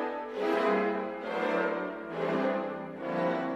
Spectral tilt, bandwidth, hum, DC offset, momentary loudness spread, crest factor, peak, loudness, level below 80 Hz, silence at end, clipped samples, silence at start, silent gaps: -7 dB/octave; 13 kHz; none; under 0.1%; 8 LU; 14 dB; -16 dBFS; -31 LUFS; -72 dBFS; 0 s; under 0.1%; 0 s; none